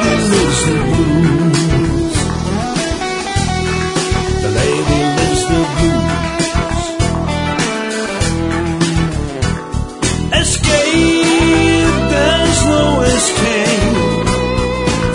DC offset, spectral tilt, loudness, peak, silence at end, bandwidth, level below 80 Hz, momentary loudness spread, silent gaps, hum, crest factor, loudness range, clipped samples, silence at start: under 0.1%; -4.5 dB/octave; -14 LUFS; 0 dBFS; 0 s; 11 kHz; -24 dBFS; 6 LU; none; none; 14 dB; 5 LU; under 0.1%; 0 s